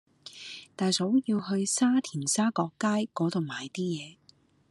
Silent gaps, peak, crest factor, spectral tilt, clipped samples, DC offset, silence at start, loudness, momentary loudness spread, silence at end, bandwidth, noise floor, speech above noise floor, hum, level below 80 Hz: none; -12 dBFS; 16 dB; -4.5 dB/octave; under 0.1%; under 0.1%; 0.25 s; -28 LUFS; 17 LU; 0.55 s; 12.5 kHz; -63 dBFS; 35 dB; none; -76 dBFS